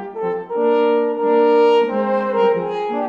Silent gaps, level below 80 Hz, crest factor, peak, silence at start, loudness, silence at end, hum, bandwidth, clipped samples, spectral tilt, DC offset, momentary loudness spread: none; -64 dBFS; 12 dB; -4 dBFS; 0 s; -17 LUFS; 0 s; none; 6.8 kHz; under 0.1%; -7 dB/octave; under 0.1%; 9 LU